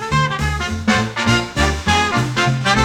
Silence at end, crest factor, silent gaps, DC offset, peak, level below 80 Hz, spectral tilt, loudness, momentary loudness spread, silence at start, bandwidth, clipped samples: 0 s; 16 dB; none; under 0.1%; -2 dBFS; -30 dBFS; -4.5 dB/octave; -17 LUFS; 4 LU; 0 s; 18 kHz; under 0.1%